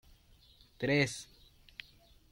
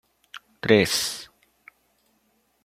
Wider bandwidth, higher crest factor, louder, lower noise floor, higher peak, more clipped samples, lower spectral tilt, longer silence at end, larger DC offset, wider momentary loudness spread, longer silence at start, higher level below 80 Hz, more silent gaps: about the same, 16.5 kHz vs 16.5 kHz; about the same, 22 dB vs 24 dB; second, -33 LUFS vs -22 LUFS; second, -63 dBFS vs -68 dBFS; second, -16 dBFS vs -4 dBFS; neither; first, -5 dB/octave vs -3.5 dB/octave; second, 1.1 s vs 1.4 s; neither; second, 21 LU vs 26 LU; first, 0.8 s vs 0.35 s; about the same, -64 dBFS vs -62 dBFS; neither